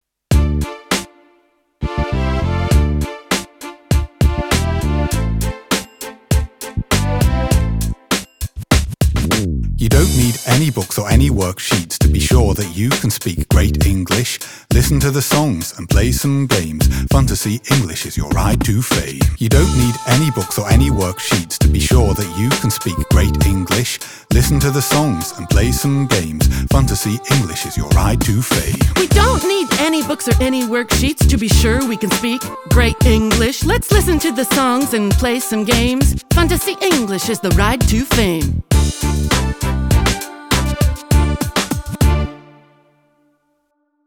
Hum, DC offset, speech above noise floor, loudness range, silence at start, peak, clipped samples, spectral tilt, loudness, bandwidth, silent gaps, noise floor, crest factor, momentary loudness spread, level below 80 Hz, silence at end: none; under 0.1%; 51 dB; 4 LU; 0.3 s; 0 dBFS; under 0.1%; -5 dB/octave; -16 LUFS; 18.5 kHz; none; -65 dBFS; 14 dB; 7 LU; -20 dBFS; 1.65 s